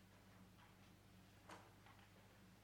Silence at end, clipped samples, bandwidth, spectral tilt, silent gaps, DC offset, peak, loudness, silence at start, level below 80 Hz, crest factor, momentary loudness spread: 0 s; under 0.1%; 19.5 kHz; -4.5 dB/octave; none; under 0.1%; -44 dBFS; -66 LUFS; 0 s; -78 dBFS; 22 dB; 5 LU